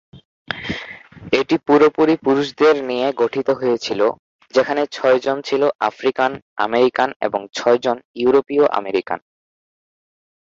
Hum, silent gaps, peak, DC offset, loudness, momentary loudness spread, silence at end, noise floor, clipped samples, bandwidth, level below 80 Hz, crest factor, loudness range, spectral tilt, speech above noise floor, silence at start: none; 0.25-0.45 s, 4.19-4.39 s, 5.75-5.79 s, 6.42-6.56 s, 7.16-7.20 s, 8.05-8.14 s; -2 dBFS; under 0.1%; -18 LUFS; 11 LU; 1.35 s; -37 dBFS; under 0.1%; 7.6 kHz; -58 dBFS; 18 dB; 2 LU; -5 dB/octave; 20 dB; 0.15 s